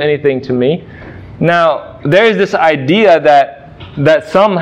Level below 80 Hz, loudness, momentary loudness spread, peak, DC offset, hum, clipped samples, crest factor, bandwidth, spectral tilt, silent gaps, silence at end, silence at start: -46 dBFS; -11 LUFS; 13 LU; 0 dBFS; under 0.1%; none; under 0.1%; 10 dB; 9.6 kHz; -6.5 dB/octave; none; 0 s; 0 s